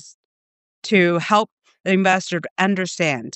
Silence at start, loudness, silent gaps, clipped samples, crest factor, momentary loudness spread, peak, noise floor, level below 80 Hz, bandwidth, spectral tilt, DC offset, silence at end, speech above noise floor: 0.05 s; -19 LUFS; 0.14-0.82 s, 1.52-1.57 s, 1.80-1.84 s, 2.51-2.56 s; under 0.1%; 20 dB; 11 LU; -2 dBFS; under -90 dBFS; -72 dBFS; 8.4 kHz; -5 dB/octave; under 0.1%; 0.05 s; over 71 dB